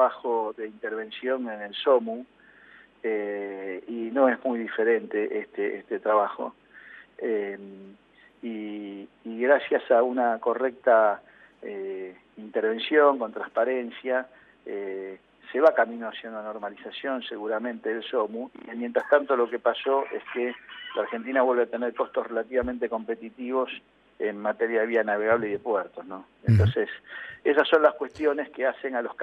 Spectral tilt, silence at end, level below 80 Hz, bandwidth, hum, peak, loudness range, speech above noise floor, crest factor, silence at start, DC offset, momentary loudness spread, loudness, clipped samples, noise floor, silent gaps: -8.5 dB/octave; 0 s; -62 dBFS; 5.8 kHz; none; -6 dBFS; 5 LU; 27 dB; 20 dB; 0 s; under 0.1%; 16 LU; -26 LUFS; under 0.1%; -54 dBFS; none